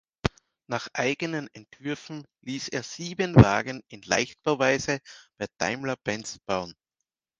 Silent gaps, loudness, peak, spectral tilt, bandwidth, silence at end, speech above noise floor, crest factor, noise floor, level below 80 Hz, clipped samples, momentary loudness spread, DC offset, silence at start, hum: none; -27 LUFS; 0 dBFS; -5.5 dB/octave; 9.6 kHz; 0.65 s; 59 dB; 26 dB; -85 dBFS; -46 dBFS; under 0.1%; 17 LU; under 0.1%; 0.25 s; none